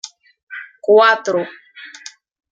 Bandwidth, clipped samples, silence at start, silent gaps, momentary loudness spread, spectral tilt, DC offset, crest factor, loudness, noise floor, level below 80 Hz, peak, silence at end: 7.8 kHz; under 0.1%; 0.05 s; 0.43-0.47 s; 26 LU; -3 dB/octave; under 0.1%; 18 dB; -14 LUFS; -40 dBFS; -74 dBFS; -2 dBFS; 0.65 s